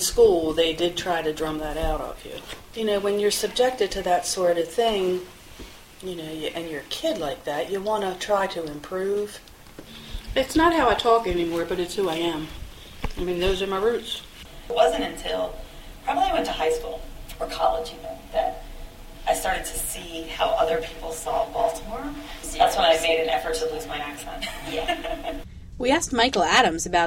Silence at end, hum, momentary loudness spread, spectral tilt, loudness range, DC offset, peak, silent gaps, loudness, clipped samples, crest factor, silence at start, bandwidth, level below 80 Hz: 0 s; none; 18 LU; -3 dB/octave; 4 LU; under 0.1%; -4 dBFS; none; -24 LUFS; under 0.1%; 22 dB; 0 s; 16.5 kHz; -40 dBFS